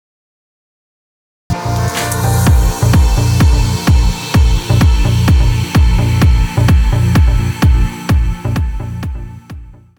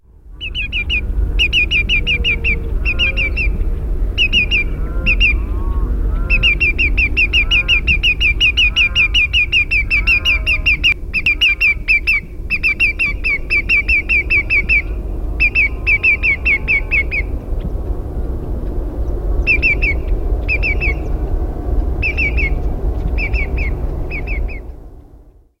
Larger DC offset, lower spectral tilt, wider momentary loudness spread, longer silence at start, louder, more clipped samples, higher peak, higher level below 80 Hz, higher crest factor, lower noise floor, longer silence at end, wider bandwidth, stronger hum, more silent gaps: neither; first, -6 dB/octave vs -4.5 dB/octave; about the same, 11 LU vs 13 LU; first, 1.5 s vs 0.25 s; about the same, -13 LUFS vs -14 LUFS; neither; about the same, 0 dBFS vs -2 dBFS; first, -14 dBFS vs -20 dBFS; about the same, 10 dB vs 14 dB; second, -32 dBFS vs -43 dBFS; second, 0.25 s vs 0.4 s; first, 20 kHz vs 11.5 kHz; neither; neither